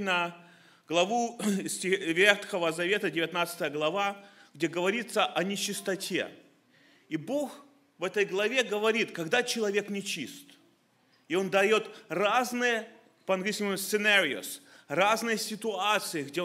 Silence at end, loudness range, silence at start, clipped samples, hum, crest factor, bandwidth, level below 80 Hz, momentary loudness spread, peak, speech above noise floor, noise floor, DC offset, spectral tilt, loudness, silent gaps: 0 s; 4 LU; 0 s; under 0.1%; none; 26 dB; 16 kHz; -80 dBFS; 11 LU; -4 dBFS; 38 dB; -67 dBFS; under 0.1%; -3 dB/octave; -29 LUFS; none